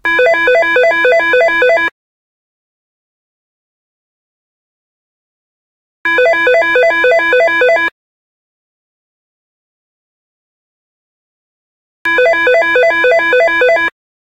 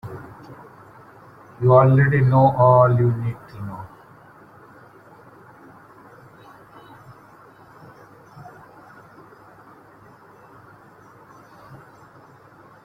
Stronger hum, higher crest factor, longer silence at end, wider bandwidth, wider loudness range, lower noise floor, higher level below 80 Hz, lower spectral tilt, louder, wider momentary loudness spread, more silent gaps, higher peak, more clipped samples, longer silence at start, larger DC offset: neither; second, 14 dB vs 20 dB; second, 0.4 s vs 9 s; first, 14.5 kHz vs 4.5 kHz; second, 8 LU vs 21 LU; first, under -90 dBFS vs -48 dBFS; about the same, -52 dBFS vs -54 dBFS; second, -2.5 dB/octave vs -10.5 dB/octave; first, -10 LUFS vs -16 LUFS; second, 5 LU vs 29 LU; first, 1.92-6.04 s, 7.92-12.05 s vs none; about the same, 0 dBFS vs -2 dBFS; neither; about the same, 0.05 s vs 0.05 s; neither